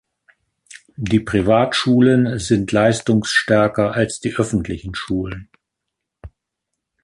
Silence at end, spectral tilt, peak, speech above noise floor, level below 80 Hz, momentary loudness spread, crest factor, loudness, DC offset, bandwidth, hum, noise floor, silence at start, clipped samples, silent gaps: 0.75 s; -5.5 dB/octave; -2 dBFS; 63 dB; -42 dBFS; 12 LU; 16 dB; -17 LUFS; under 0.1%; 11.5 kHz; none; -80 dBFS; 0.75 s; under 0.1%; none